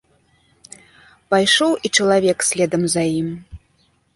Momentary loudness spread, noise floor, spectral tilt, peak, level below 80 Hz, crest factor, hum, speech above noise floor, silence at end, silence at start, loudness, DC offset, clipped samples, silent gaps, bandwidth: 9 LU; -61 dBFS; -3 dB/octave; -2 dBFS; -52 dBFS; 18 dB; none; 44 dB; 0.6 s; 1.3 s; -17 LUFS; under 0.1%; under 0.1%; none; 11.5 kHz